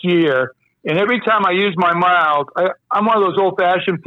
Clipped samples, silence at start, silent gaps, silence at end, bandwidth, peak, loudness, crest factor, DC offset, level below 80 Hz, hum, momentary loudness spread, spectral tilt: under 0.1%; 0.05 s; none; 0.05 s; 6.2 kHz; -6 dBFS; -16 LUFS; 8 dB; under 0.1%; -64 dBFS; none; 6 LU; -7.5 dB/octave